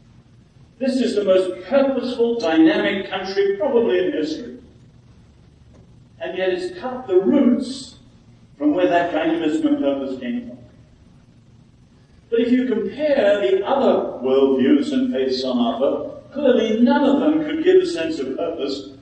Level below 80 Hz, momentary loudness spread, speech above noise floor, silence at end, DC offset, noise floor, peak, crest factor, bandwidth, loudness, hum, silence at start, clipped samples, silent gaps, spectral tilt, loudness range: -56 dBFS; 11 LU; 32 dB; 0.05 s; under 0.1%; -51 dBFS; -4 dBFS; 16 dB; 9.2 kHz; -19 LUFS; none; 0.8 s; under 0.1%; none; -5.5 dB/octave; 6 LU